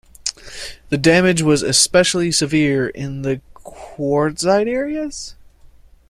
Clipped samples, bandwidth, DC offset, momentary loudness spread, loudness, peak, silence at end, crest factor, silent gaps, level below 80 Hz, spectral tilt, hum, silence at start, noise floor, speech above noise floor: under 0.1%; 15 kHz; under 0.1%; 18 LU; -17 LUFS; 0 dBFS; 0.75 s; 18 dB; none; -46 dBFS; -4 dB/octave; none; 0.25 s; -45 dBFS; 29 dB